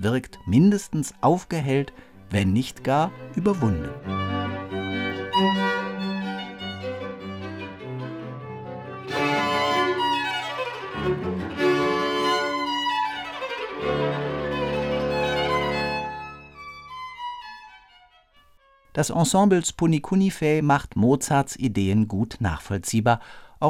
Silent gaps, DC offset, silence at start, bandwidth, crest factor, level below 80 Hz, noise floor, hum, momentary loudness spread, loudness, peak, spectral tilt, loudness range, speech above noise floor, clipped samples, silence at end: none; under 0.1%; 0 s; 16 kHz; 18 dB; -50 dBFS; -57 dBFS; none; 14 LU; -24 LUFS; -6 dBFS; -5.5 dB/octave; 8 LU; 35 dB; under 0.1%; 0 s